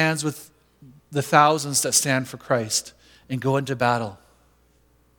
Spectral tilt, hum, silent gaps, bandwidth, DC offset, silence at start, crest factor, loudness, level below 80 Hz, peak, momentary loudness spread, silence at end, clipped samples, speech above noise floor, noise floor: -3.5 dB/octave; none; none; 19 kHz; under 0.1%; 0 s; 24 dB; -22 LUFS; -64 dBFS; 0 dBFS; 14 LU; 1.05 s; under 0.1%; 38 dB; -60 dBFS